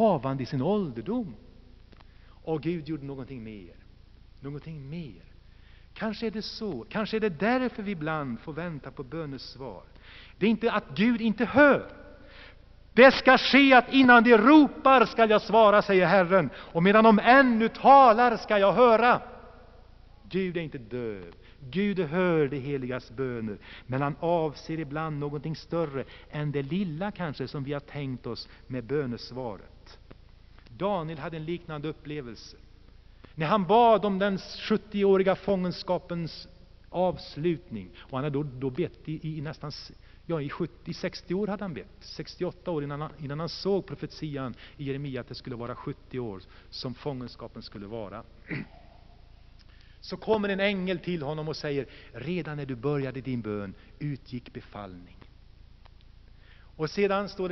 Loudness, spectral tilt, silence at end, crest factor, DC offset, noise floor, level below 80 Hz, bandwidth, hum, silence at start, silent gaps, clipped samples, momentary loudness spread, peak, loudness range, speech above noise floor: -25 LUFS; -4 dB/octave; 0 s; 22 dB; under 0.1%; -52 dBFS; -54 dBFS; 6.2 kHz; none; 0 s; none; under 0.1%; 22 LU; -4 dBFS; 18 LU; 26 dB